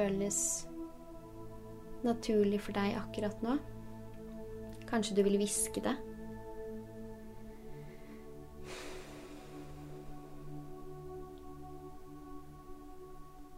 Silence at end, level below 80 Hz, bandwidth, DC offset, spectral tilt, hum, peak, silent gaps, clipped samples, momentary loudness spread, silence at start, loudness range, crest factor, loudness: 0 s; -54 dBFS; 16 kHz; under 0.1%; -4.5 dB/octave; none; -18 dBFS; none; under 0.1%; 20 LU; 0 s; 14 LU; 22 dB; -37 LUFS